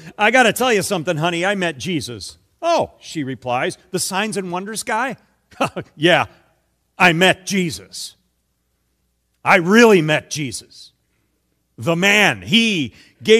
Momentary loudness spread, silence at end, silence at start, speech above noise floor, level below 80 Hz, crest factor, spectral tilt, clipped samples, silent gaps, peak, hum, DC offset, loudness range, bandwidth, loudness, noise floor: 15 LU; 0 s; 0 s; 50 dB; -58 dBFS; 18 dB; -4 dB/octave; under 0.1%; none; 0 dBFS; none; under 0.1%; 6 LU; 15 kHz; -17 LUFS; -68 dBFS